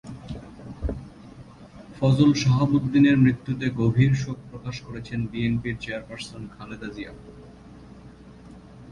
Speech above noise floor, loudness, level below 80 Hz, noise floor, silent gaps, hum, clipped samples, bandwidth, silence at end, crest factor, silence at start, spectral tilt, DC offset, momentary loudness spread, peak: 23 dB; -23 LUFS; -44 dBFS; -46 dBFS; none; none; under 0.1%; 10.5 kHz; 0 s; 20 dB; 0.05 s; -7 dB/octave; under 0.1%; 20 LU; -6 dBFS